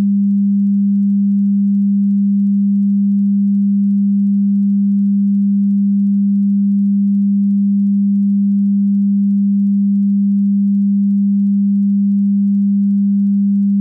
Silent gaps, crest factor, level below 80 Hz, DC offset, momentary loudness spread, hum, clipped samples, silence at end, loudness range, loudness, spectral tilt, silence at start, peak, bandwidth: none; 4 dB; -72 dBFS; under 0.1%; 0 LU; none; under 0.1%; 0 s; 0 LU; -14 LUFS; -14.5 dB/octave; 0 s; -10 dBFS; 0.3 kHz